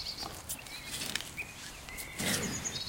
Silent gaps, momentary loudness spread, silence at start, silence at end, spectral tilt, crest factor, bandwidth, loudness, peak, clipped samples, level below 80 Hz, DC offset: none; 10 LU; 0 s; 0 s; -2 dB/octave; 26 dB; 17 kHz; -37 LUFS; -12 dBFS; under 0.1%; -56 dBFS; under 0.1%